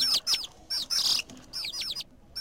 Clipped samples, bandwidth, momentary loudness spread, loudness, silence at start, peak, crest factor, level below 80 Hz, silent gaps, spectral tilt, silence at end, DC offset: under 0.1%; 16.5 kHz; 13 LU; -28 LUFS; 0 s; -14 dBFS; 18 dB; -60 dBFS; none; 1 dB/octave; 0 s; 0.1%